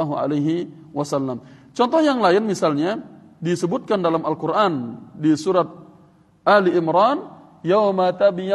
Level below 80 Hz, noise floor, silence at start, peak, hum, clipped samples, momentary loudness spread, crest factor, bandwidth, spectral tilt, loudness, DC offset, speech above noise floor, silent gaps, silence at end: -68 dBFS; -53 dBFS; 0 s; -2 dBFS; none; under 0.1%; 12 LU; 18 dB; 12 kHz; -6 dB/octave; -20 LUFS; under 0.1%; 34 dB; none; 0 s